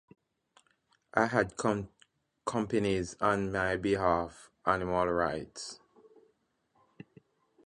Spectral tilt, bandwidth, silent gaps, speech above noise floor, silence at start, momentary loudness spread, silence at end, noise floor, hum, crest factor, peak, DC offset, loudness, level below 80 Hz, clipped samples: -5.5 dB/octave; 11 kHz; none; 44 dB; 1.15 s; 14 LU; 1.9 s; -74 dBFS; none; 24 dB; -10 dBFS; under 0.1%; -31 LUFS; -56 dBFS; under 0.1%